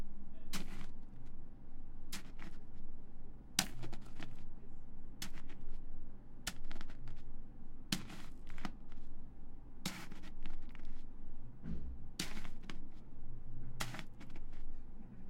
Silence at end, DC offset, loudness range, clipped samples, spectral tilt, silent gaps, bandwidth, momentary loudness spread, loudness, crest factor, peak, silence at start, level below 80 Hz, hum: 0 s; under 0.1%; 6 LU; under 0.1%; -3 dB/octave; none; 15.5 kHz; 14 LU; -49 LUFS; 26 dB; -12 dBFS; 0 s; -44 dBFS; none